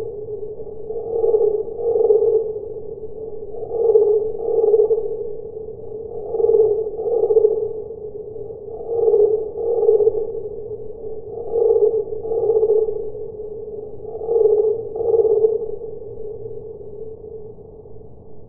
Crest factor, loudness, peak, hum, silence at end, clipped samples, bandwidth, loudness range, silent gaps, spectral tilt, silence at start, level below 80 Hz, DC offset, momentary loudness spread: 18 dB; -19 LUFS; -2 dBFS; none; 0 s; under 0.1%; 1.3 kHz; 2 LU; none; -16 dB/octave; 0 s; -50 dBFS; under 0.1%; 17 LU